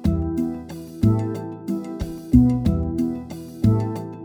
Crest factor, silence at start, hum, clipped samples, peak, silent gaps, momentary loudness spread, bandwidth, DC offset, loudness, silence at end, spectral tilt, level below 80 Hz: 20 dB; 0 s; none; under 0.1%; -2 dBFS; none; 14 LU; 16 kHz; under 0.1%; -22 LUFS; 0 s; -9 dB/octave; -32 dBFS